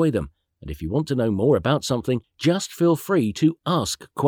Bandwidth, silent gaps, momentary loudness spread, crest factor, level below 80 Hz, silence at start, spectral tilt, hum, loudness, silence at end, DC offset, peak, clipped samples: over 20 kHz; none; 10 LU; 16 dB; -46 dBFS; 0 s; -6 dB/octave; none; -22 LUFS; 0 s; under 0.1%; -6 dBFS; under 0.1%